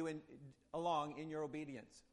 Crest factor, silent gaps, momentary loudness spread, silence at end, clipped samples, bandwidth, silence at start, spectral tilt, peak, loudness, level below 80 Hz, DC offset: 18 dB; none; 16 LU; 0.1 s; under 0.1%; 11.5 kHz; 0 s; -6 dB/octave; -28 dBFS; -44 LUFS; -78 dBFS; under 0.1%